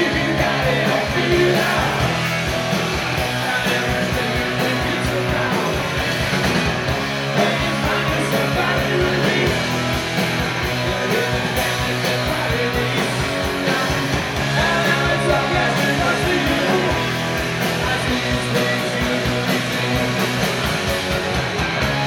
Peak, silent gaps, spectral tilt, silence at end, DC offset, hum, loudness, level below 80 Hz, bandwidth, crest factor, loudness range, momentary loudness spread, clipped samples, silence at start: -4 dBFS; none; -4.5 dB/octave; 0 s; under 0.1%; none; -19 LUFS; -34 dBFS; 19 kHz; 14 dB; 2 LU; 3 LU; under 0.1%; 0 s